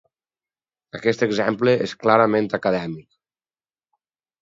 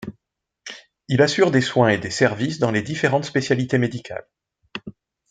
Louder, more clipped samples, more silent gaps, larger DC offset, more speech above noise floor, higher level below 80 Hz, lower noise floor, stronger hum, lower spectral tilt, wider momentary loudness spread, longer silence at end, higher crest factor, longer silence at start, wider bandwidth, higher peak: about the same, -20 LUFS vs -20 LUFS; neither; neither; neither; first, over 70 dB vs 59 dB; about the same, -62 dBFS vs -60 dBFS; first, under -90 dBFS vs -79 dBFS; neither; about the same, -6 dB/octave vs -5.5 dB/octave; second, 14 LU vs 20 LU; first, 1.4 s vs 0.4 s; about the same, 22 dB vs 20 dB; first, 0.95 s vs 0 s; second, 7.8 kHz vs 9.4 kHz; about the same, 0 dBFS vs -2 dBFS